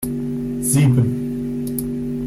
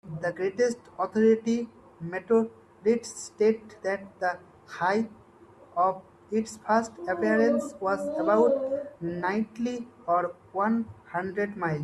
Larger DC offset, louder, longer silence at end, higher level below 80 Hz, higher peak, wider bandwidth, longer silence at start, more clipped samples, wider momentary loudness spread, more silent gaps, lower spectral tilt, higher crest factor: neither; first, -20 LUFS vs -28 LUFS; about the same, 0 s vs 0 s; first, -40 dBFS vs -68 dBFS; first, -6 dBFS vs -10 dBFS; first, 16 kHz vs 11.5 kHz; about the same, 0 s vs 0.05 s; neither; second, 10 LU vs 13 LU; neither; about the same, -6.5 dB/octave vs -6 dB/octave; about the same, 14 dB vs 16 dB